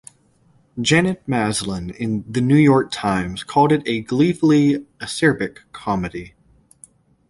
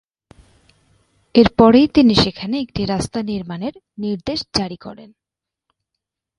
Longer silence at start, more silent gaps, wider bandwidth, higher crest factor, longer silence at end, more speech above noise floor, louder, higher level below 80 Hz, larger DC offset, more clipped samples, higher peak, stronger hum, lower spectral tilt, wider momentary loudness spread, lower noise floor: second, 0.75 s vs 1.35 s; neither; about the same, 11.5 kHz vs 11.5 kHz; about the same, 18 dB vs 18 dB; second, 1 s vs 1.35 s; second, 39 dB vs 69 dB; about the same, -19 LUFS vs -17 LUFS; second, -48 dBFS vs -42 dBFS; neither; neither; about the same, -2 dBFS vs 0 dBFS; neither; about the same, -5.5 dB/octave vs -6 dB/octave; second, 12 LU vs 17 LU; second, -57 dBFS vs -86 dBFS